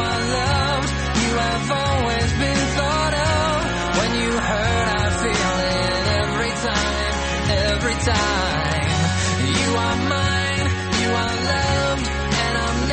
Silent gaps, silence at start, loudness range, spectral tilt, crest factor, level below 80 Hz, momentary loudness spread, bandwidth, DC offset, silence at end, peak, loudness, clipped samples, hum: none; 0 s; 0 LU; -4 dB/octave; 14 dB; -30 dBFS; 2 LU; 8.8 kHz; under 0.1%; 0 s; -6 dBFS; -20 LUFS; under 0.1%; none